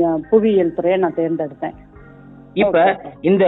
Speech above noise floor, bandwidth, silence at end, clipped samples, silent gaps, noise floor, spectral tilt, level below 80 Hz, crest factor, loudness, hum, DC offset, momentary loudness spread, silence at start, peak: 25 dB; 4.1 kHz; 0 s; under 0.1%; none; -41 dBFS; -10 dB/octave; -50 dBFS; 14 dB; -17 LUFS; none; under 0.1%; 12 LU; 0 s; -2 dBFS